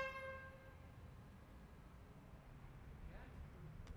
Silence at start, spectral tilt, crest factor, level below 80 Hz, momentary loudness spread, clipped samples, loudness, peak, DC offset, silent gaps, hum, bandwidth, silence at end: 0 s; -6 dB/octave; 22 dB; -60 dBFS; 9 LU; under 0.1%; -57 LUFS; -34 dBFS; under 0.1%; none; none; over 20 kHz; 0 s